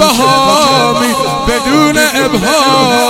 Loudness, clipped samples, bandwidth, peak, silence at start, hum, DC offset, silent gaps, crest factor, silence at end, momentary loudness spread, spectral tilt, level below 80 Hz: -9 LUFS; 0.3%; 17 kHz; 0 dBFS; 0 s; none; under 0.1%; none; 10 dB; 0 s; 4 LU; -3 dB/octave; -32 dBFS